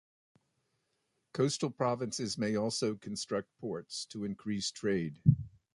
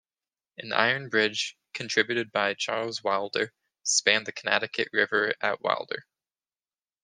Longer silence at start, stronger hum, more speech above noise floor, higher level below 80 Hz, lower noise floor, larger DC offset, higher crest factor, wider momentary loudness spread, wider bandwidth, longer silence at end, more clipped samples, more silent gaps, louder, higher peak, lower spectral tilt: first, 1.35 s vs 0.6 s; neither; second, 47 dB vs over 63 dB; first, -60 dBFS vs -76 dBFS; second, -80 dBFS vs under -90 dBFS; neither; about the same, 24 dB vs 26 dB; about the same, 10 LU vs 9 LU; about the same, 11.5 kHz vs 10.5 kHz; second, 0.25 s vs 1 s; neither; neither; second, -34 LUFS vs -26 LUFS; second, -12 dBFS vs -4 dBFS; first, -5.5 dB/octave vs -1.5 dB/octave